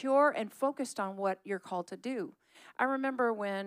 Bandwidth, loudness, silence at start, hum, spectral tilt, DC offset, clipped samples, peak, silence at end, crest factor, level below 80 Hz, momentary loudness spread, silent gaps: 15.5 kHz; -33 LUFS; 0 s; none; -5 dB/octave; under 0.1%; under 0.1%; -16 dBFS; 0 s; 16 dB; under -90 dBFS; 11 LU; none